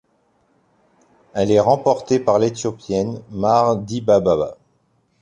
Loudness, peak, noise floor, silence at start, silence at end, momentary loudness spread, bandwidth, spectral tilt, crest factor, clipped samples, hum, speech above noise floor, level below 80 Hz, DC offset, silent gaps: -18 LUFS; -2 dBFS; -63 dBFS; 1.35 s; 0.65 s; 9 LU; 9.8 kHz; -6.5 dB/octave; 18 dB; under 0.1%; none; 46 dB; -50 dBFS; under 0.1%; none